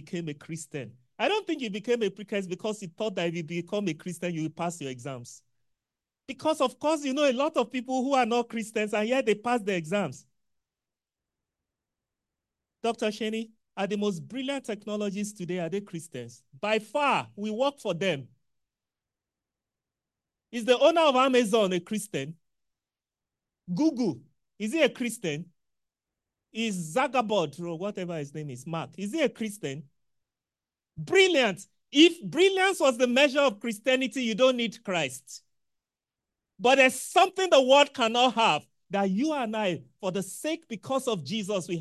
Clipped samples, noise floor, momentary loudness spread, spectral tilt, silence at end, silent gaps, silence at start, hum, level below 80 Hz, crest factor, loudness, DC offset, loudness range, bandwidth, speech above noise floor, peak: under 0.1%; under -90 dBFS; 15 LU; -4 dB/octave; 0 s; none; 0.05 s; none; -76 dBFS; 22 dB; -27 LUFS; under 0.1%; 11 LU; 12.5 kHz; over 63 dB; -6 dBFS